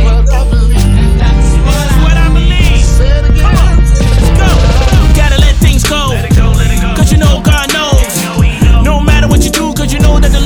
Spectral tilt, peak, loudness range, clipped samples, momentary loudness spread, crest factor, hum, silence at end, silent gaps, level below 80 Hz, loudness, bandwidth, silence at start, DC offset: -5 dB/octave; 0 dBFS; 1 LU; under 0.1%; 2 LU; 6 dB; none; 0 s; none; -8 dBFS; -9 LUFS; 15.5 kHz; 0 s; under 0.1%